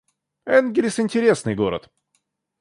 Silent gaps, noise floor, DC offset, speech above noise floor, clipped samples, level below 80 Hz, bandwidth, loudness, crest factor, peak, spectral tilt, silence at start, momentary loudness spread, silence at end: none; -71 dBFS; under 0.1%; 52 dB; under 0.1%; -56 dBFS; 11.5 kHz; -20 LUFS; 18 dB; -4 dBFS; -5.5 dB/octave; 0.45 s; 10 LU; 0.8 s